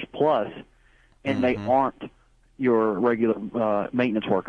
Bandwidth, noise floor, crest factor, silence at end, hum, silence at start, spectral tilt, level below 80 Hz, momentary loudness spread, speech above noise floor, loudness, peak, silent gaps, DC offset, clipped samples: 6.6 kHz; -58 dBFS; 16 dB; 0 s; none; 0 s; -8 dB/octave; -56 dBFS; 12 LU; 35 dB; -24 LUFS; -10 dBFS; none; under 0.1%; under 0.1%